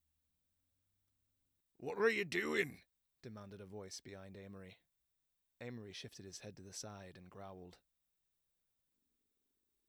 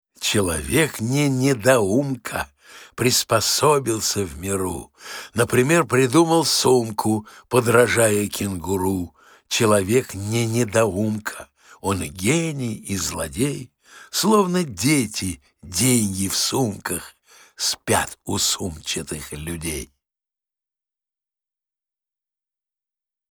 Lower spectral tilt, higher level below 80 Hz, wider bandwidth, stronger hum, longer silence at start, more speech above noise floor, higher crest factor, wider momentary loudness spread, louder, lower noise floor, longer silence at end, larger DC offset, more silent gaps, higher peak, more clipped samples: about the same, -4 dB/octave vs -4 dB/octave; second, -82 dBFS vs -48 dBFS; about the same, over 20 kHz vs over 20 kHz; neither; first, 1.8 s vs 0.2 s; second, 42 dB vs over 69 dB; first, 26 dB vs 20 dB; first, 20 LU vs 12 LU; second, -42 LUFS vs -21 LUFS; second, -85 dBFS vs under -90 dBFS; second, 2.1 s vs 3.45 s; neither; neither; second, -22 dBFS vs -2 dBFS; neither